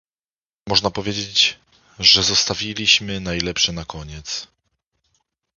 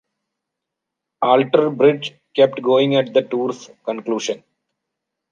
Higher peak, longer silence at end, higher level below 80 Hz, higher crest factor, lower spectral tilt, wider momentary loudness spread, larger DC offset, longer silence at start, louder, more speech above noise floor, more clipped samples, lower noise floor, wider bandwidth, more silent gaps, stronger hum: about the same, 0 dBFS vs -2 dBFS; first, 1.15 s vs 0.95 s; first, -44 dBFS vs -72 dBFS; about the same, 22 dB vs 18 dB; second, -2 dB/octave vs -5.5 dB/octave; first, 16 LU vs 12 LU; neither; second, 0.65 s vs 1.2 s; about the same, -17 LUFS vs -18 LUFS; first, over 70 dB vs 65 dB; neither; first, under -90 dBFS vs -82 dBFS; second, 7.4 kHz vs 9 kHz; neither; neither